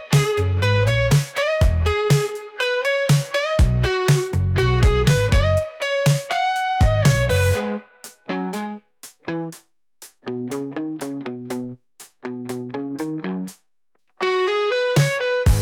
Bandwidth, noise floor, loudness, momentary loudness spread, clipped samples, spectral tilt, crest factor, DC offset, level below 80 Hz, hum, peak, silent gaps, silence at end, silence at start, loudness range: 18 kHz; -72 dBFS; -20 LUFS; 14 LU; under 0.1%; -5.5 dB/octave; 14 dB; under 0.1%; -28 dBFS; none; -6 dBFS; none; 0 s; 0 s; 12 LU